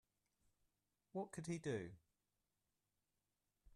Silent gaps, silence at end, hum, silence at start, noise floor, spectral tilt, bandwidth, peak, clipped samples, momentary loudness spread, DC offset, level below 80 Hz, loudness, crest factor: none; 0.05 s; 50 Hz at -75 dBFS; 1.15 s; -90 dBFS; -6 dB/octave; 12 kHz; -34 dBFS; under 0.1%; 11 LU; under 0.1%; -80 dBFS; -49 LUFS; 20 dB